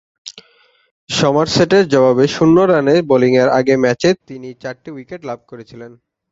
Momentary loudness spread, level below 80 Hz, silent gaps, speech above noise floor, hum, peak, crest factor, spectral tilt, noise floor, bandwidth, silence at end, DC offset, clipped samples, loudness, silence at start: 20 LU; -52 dBFS; 0.91-1.07 s; 40 dB; none; 0 dBFS; 14 dB; -5.5 dB/octave; -54 dBFS; 8 kHz; 0.45 s; under 0.1%; under 0.1%; -13 LUFS; 0.25 s